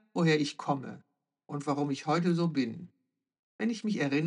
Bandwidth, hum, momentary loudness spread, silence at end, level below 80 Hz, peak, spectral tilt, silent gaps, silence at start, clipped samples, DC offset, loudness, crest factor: 10.5 kHz; none; 10 LU; 0 s; under -90 dBFS; -14 dBFS; -6.5 dB/octave; 3.39-3.59 s; 0.15 s; under 0.1%; under 0.1%; -31 LUFS; 18 dB